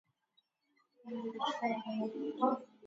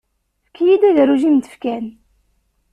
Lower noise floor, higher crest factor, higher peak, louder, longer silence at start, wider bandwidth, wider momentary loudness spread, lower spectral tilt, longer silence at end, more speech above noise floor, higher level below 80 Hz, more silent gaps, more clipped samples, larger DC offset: first, -78 dBFS vs -68 dBFS; first, 22 dB vs 14 dB; second, -16 dBFS vs -4 dBFS; second, -37 LUFS vs -15 LUFS; first, 1.05 s vs 0.6 s; second, 7.6 kHz vs 10.5 kHz; second, 10 LU vs 14 LU; second, -3 dB/octave vs -6.5 dB/octave; second, 0 s vs 0.8 s; second, 41 dB vs 54 dB; second, under -90 dBFS vs -58 dBFS; neither; neither; neither